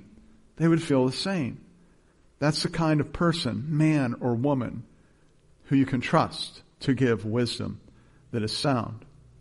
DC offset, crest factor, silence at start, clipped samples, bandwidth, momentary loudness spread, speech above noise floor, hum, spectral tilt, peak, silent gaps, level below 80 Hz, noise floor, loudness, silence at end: under 0.1%; 20 dB; 0.6 s; under 0.1%; 11.5 kHz; 12 LU; 34 dB; none; -6 dB/octave; -8 dBFS; none; -54 dBFS; -60 dBFS; -26 LUFS; 0.4 s